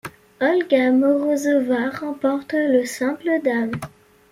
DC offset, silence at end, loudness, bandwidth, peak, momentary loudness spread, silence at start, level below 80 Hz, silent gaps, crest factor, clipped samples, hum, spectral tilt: under 0.1%; 0.45 s; -20 LUFS; 15.5 kHz; -4 dBFS; 9 LU; 0.05 s; -62 dBFS; none; 16 dB; under 0.1%; none; -5 dB/octave